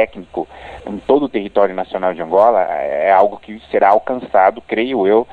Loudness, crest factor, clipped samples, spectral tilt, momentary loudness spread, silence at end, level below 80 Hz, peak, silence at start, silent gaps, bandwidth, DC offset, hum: -15 LUFS; 16 dB; under 0.1%; -7.5 dB/octave; 14 LU; 0 s; -50 dBFS; 0 dBFS; 0 s; none; 4.8 kHz; under 0.1%; none